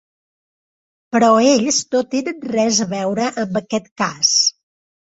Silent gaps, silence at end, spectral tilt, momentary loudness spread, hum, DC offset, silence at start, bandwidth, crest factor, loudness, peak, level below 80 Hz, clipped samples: 3.91-3.96 s; 0.55 s; -2.5 dB/octave; 10 LU; none; under 0.1%; 1.1 s; 8 kHz; 16 dB; -17 LUFS; -2 dBFS; -62 dBFS; under 0.1%